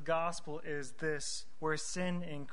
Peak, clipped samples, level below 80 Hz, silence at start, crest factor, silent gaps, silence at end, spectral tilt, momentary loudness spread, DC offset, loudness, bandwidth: -20 dBFS; under 0.1%; -64 dBFS; 0 s; 18 dB; none; 0 s; -4 dB/octave; 6 LU; 1%; -38 LUFS; 11 kHz